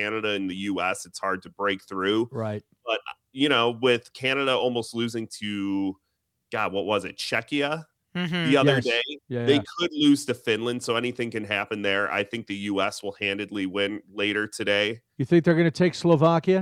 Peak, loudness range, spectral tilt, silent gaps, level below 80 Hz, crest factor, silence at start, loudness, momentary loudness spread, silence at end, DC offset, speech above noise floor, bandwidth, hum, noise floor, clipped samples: -6 dBFS; 4 LU; -5 dB/octave; none; -68 dBFS; 20 dB; 0 s; -25 LUFS; 10 LU; 0 s; under 0.1%; 51 dB; 15 kHz; none; -76 dBFS; under 0.1%